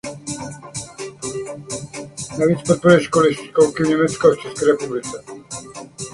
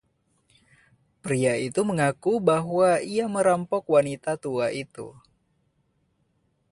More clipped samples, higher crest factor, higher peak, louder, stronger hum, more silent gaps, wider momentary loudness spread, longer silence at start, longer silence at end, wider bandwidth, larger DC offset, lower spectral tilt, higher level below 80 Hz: neither; about the same, 20 dB vs 18 dB; first, 0 dBFS vs -8 dBFS; first, -18 LUFS vs -24 LUFS; neither; neither; first, 18 LU vs 12 LU; second, 0.05 s vs 1.25 s; second, 0 s vs 1.6 s; about the same, 11.5 kHz vs 11.5 kHz; neither; about the same, -5 dB/octave vs -5.5 dB/octave; first, -52 dBFS vs -66 dBFS